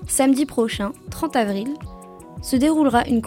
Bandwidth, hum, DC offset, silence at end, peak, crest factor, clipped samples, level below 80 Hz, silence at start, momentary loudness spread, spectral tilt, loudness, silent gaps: 16.5 kHz; none; under 0.1%; 0 s; -6 dBFS; 16 dB; under 0.1%; -42 dBFS; 0 s; 17 LU; -4.5 dB/octave; -21 LUFS; none